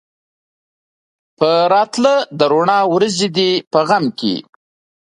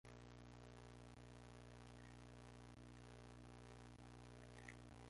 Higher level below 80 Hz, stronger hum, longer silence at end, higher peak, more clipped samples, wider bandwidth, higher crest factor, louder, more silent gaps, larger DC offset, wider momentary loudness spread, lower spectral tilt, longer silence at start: first, -62 dBFS vs -68 dBFS; second, none vs 60 Hz at -65 dBFS; first, 0.6 s vs 0 s; first, 0 dBFS vs -42 dBFS; neither; about the same, 11 kHz vs 11.5 kHz; about the same, 16 dB vs 20 dB; first, -14 LUFS vs -62 LUFS; first, 3.67-3.71 s vs none; neither; first, 6 LU vs 2 LU; about the same, -4.5 dB/octave vs -5.5 dB/octave; first, 1.4 s vs 0.05 s